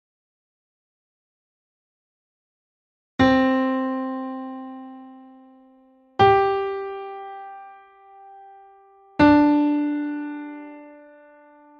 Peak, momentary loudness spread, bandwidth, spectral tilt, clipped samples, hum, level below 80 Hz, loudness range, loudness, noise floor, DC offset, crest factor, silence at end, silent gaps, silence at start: -4 dBFS; 23 LU; 6.6 kHz; -7.5 dB/octave; under 0.1%; none; -54 dBFS; 2 LU; -20 LUFS; -55 dBFS; under 0.1%; 20 dB; 0.85 s; none; 3.2 s